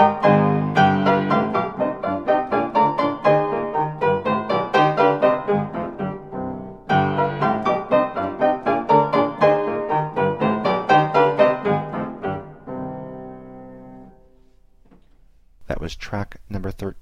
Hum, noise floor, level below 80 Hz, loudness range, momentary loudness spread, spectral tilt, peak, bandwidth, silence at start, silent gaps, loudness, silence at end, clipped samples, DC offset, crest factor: none; -54 dBFS; -46 dBFS; 16 LU; 15 LU; -7.5 dB/octave; -2 dBFS; 8 kHz; 0 s; none; -20 LUFS; 0 s; under 0.1%; 0.2%; 18 dB